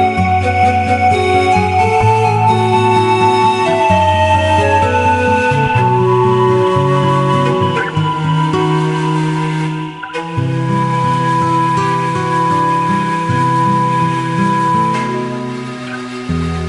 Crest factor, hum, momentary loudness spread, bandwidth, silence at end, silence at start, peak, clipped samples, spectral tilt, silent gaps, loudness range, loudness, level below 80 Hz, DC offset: 12 dB; none; 7 LU; 11.5 kHz; 0 s; 0 s; 0 dBFS; under 0.1%; -6.5 dB/octave; none; 4 LU; -13 LUFS; -40 dBFS; under 0.1%